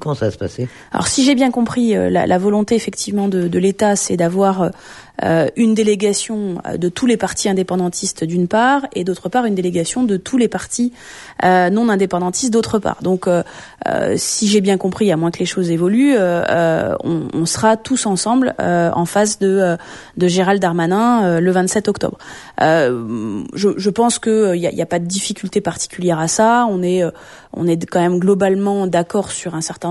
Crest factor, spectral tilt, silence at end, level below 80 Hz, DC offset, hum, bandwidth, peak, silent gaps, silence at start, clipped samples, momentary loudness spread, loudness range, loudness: 14 dB; -5 dB/octave; 0 s; -50 dBFS; under 0.1%; none; 12 kHz; -2 dBFS; none; 0 s; under 0.1%; 8 LU; 2 LU; -16 LUFS